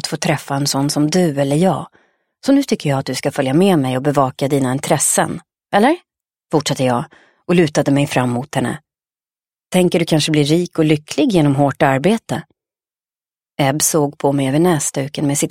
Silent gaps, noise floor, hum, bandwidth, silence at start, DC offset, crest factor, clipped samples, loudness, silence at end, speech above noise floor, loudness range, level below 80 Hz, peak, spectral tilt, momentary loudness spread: none; under -90 dBFS; none; 16.5 kHz; 0.05 s; under 0.1%; 16 dB; under 0.1%; -16 LUFS; 0 s; over 74 dB; 2 LU; -56 dBFS; 0 dBFS; -5 dB/octave; 7 LU